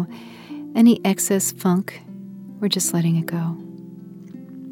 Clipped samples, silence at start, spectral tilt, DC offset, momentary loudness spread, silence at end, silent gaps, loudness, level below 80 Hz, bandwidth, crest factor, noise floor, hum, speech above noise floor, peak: under 0.1%; 0 s; -5 dB/octave; under 0.1%; 23 LU; 0 s; none; -20 LUFS; -72 dBFS; 17.5 kHz; 16 dB; -39 dBFS; none; 19 dB; -6 dBFS